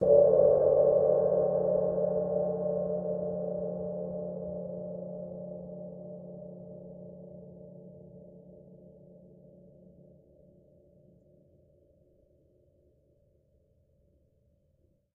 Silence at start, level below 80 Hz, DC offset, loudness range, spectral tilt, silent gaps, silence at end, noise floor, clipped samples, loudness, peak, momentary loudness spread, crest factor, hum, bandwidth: 0 s; -64 dBFS; under 0.1%; 25 LU; -9.5 dB/octave; none; 6.4 s; -70 dBFS; under 0.1%; -29 LUFS; -10 dBFS; 26 LU; 22 dB; none; 1.8 kHz